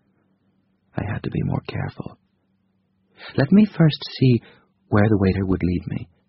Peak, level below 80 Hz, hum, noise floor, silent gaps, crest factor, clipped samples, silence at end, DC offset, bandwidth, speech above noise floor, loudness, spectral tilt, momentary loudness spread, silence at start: -4 dBFS; -46 dBFS; none; -67 dBFS; none; 18 dB; under 0.1%; 0.25 s; under 0.1%; 5.8 kHz; 47 dB; -21 LUFS; -7 dB/octave; 15 LU; 0.95 s